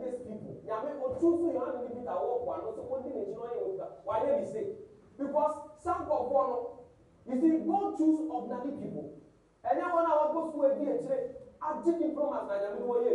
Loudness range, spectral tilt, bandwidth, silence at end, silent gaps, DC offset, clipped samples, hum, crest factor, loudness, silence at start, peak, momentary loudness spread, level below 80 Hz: 4 LU; -8 dB/octave; 10.5 kHz; 0 s; none; under 0.1%; under 0.1%; none; 16 dB; -32 LUFS; 0 s; -16 dBFS; 12 LU; -68 dBFS